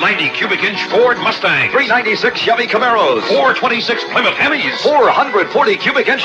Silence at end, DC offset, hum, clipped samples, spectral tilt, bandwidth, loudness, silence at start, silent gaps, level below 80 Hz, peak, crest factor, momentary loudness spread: 0 s; under 0.1%; none; under 0.1%; -4 dB/octave; 10 kHz; -13 LUFS; 0 s; none; -58 dBFS; -2 dBFS; 12 dB; 3 LU